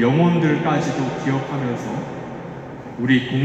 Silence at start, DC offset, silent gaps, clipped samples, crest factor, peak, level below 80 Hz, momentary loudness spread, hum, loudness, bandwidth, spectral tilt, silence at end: 0 s; under 0.1%; none; under 0.1%; 16 dB; -4 dBFS; -54 dBFS; 16 LU; none; -21 LUFS; 8.2 kHz; -7 dB/octave; 0 s